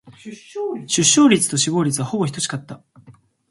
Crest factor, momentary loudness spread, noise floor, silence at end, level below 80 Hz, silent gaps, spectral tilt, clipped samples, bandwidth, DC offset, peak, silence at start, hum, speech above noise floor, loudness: 18 dB; 20 LU; -49 dBFS; 0.4 s; -62 dBFS; none; -3.5 dB/octave; under 0.1%; 12 kHz; under 0.1%; -2 dBFS; 0.05 s; none; 30 dB; -18 LUFS